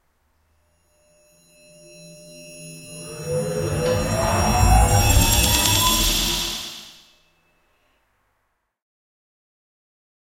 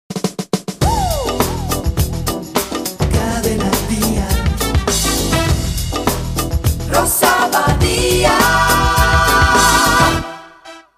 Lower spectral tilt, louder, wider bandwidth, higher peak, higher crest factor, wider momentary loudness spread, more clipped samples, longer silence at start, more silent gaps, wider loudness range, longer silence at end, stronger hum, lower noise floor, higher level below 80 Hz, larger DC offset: about the same, -3.5 dB/octave vs -4 dB/octave; second, -18 LUFS vs -15 LUFS; about the same, 16 kHz vs 15.5 kHz; about the same, -2 dBFS vs 0 dBFS; about the same, 20 dB vs 16 dB; first, 22 LU vs 9 LU; neither; first, 2 s vs 0.1 s; neither; first, 15 LU vs 6 LU; first, 3.5 s vs 0.2 s; neither; first, -72 dBFS vs -39 dBFS; about the same, -28 dBFS vs -24 dBFS; neither